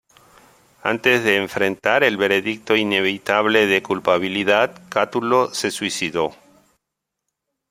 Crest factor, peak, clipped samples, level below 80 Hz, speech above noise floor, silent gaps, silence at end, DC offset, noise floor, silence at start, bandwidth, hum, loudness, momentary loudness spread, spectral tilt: 20 dB; -2 dBFS; under 0.1%; -62 dBFS; 62 dB; none; 1.4 s; under 0.1%; -81 dBFS; 0.85 s; 16 kHz; none; -19 LUFS; 6 LU; -3.5 dB/octave